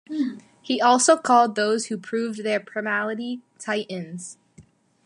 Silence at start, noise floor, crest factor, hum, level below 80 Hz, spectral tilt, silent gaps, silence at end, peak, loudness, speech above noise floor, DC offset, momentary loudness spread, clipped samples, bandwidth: 0.1 s; -54 dBFS; 20 dB; none; -74 dBFS; -3 dB/octave; none; 0.45 s; -4 dBFS; -23 LUFS; 31 dB; under 0.1%; 16 LU; under 0.1%; 11.5 kHz